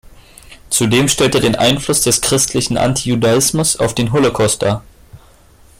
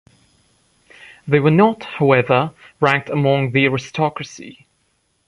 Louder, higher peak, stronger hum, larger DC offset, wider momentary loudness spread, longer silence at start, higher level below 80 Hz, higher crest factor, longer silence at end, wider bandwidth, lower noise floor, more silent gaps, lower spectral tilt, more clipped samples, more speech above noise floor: first, -14 LUFS vs -17 LUFS; about the same, -2 dBFS vs 0 dBFS; neither; neither; second, 4 LU vs 15 LU; second, 0.1 s vs 1.25 s; first, -40 dBFS vs -58 dBFS; about the same, 14 dB vs 18 dB; about the same, 0.65 s vs 0.75 s; first, 16.5 kHz vs 10.5 kHz; second, -45 dBFS vs -65 dBFS; neither; second, -3.5 dB/octave vs -7 dB/octave; neither; second, 31 dB vs 48 dB